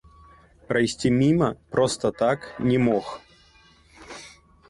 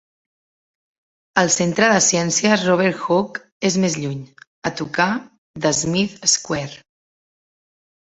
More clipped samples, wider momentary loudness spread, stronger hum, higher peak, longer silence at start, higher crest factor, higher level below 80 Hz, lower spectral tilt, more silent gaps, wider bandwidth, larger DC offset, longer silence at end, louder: neither; first, 21 LU vs 12 LU; neither; second, -8 dBFS vs -2 dBFS; second, 0.7 s vs 1.35 s; about the same, 18 dB vs 20 dB; about the same, -52 dBFS vs -56 dBFS; first, -6 dB/octave vs -3.5 dB/octave; second, none vs 3.52-3.61 s, 4.47-4.62 s, 5.38-5.54 s; first, 11.5 kHz vs 8.4 kHz; neither; second, 0.4 s vs 1.35 s; second, -23 LUFS vs -18 LUFS